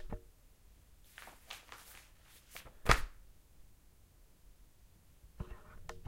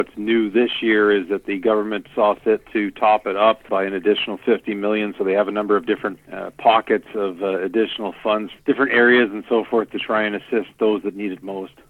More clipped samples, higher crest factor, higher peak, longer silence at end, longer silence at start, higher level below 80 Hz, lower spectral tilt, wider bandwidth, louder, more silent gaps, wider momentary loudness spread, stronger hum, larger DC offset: neither; first, 36 dB vs 16 dB; second, -8 dBFS vs -4 dBFS; second, 0 s vs 0.25 s; about the same, 0 s vs 0 s; first, -48 dBFS vs -60 dBFS; second, -3.5 dB/octave vs -6.5 dB/octave; first, 16 kHz vs 4.3 kHz; second, -39 LUFS vs -20 LUFS; neither; first, 25 LU vs 8 LU; neither; neither